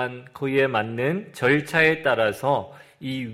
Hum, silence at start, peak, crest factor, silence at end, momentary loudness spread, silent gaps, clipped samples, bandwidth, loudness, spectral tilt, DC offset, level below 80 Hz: none; 0 s; -6 dBFS; 18 dB; 0 s; 12 LU; none; under 0.1%; 16 kHz; -22 LUFS; -6 dB/octave; under 0.1%; -62 dBFS